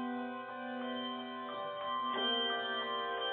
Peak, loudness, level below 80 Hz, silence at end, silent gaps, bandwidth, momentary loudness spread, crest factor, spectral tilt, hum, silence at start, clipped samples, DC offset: -24 dBFS; -37 LUFS; -86 dBFS; 0 s; none; 4.5 kHz; 10 LU; 14 dB; 1 dB/octave; none; 0 s; under 0.1%; under 0.1%